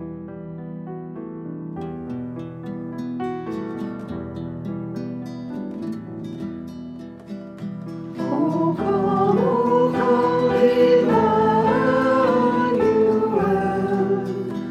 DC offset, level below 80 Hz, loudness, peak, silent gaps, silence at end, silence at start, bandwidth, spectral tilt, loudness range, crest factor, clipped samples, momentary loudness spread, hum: under 0.1%; -52 dBFS; -21 LUFS; -6 dBFS; none; 0 s; 0 s; 9 kHz; -8 dB/octave; 14 LU; 16 dB; under 0.1%; 16 LU; none